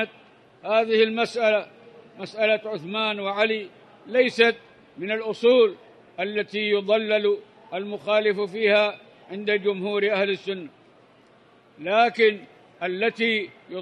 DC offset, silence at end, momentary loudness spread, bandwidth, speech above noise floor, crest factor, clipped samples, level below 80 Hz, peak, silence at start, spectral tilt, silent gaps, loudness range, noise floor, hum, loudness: under 0.1%; 0 s; 16 LU; 10 kHz; 32 dB; 20 dB; under 0.1%; -78 dBFS; -4 dBFS; 0 s; -5 dB/octave; none; 2 LU; -55 dBFS; none; -23 LUFS